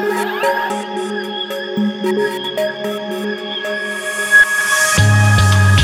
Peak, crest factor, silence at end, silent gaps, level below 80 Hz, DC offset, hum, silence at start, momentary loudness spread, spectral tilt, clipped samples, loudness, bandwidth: 0 dBFS; 14 dB; 0 s; none; -38 dBFS; under 0.1%; none; 0 s; 11 LU; -4 dB/octave; under 0.1%; -15 LUFS; 16 kHz